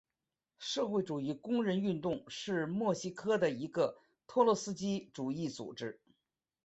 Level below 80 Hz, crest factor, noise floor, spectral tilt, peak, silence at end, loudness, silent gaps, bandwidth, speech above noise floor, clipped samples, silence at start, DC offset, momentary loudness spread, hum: -74 dBFS; 22 dB; under -90 dBFS; -5.5 dB/octave; -14 dBFS; 0.7 s; -36 LUFS; none; 8.2 kHz; over 55 dB; under 0.1%; 0.6 s; under 0.1%; 10 LU; none